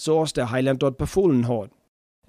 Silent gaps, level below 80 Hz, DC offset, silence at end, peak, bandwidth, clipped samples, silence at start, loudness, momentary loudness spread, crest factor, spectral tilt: none; -46 dBFS; under 0.1%; 0.6 s; -8 dBFS; 15 kHz; under 0.1%; 0 s; -22 LUFS; 7 LU; 14 dB; -6.5 dB/octave